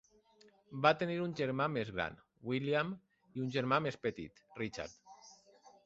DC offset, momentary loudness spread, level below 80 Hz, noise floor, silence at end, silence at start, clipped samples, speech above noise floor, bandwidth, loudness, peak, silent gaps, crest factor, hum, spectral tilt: under 0.1%; 18 LU; -68 dBFS; -67 dBFS; 0.15 s; 0.7 s; under 0.1%; 31 dB; 8 kHz; -36 LUFS; -12 dBFS; none; 26 dB; none; -4.5 dB/octave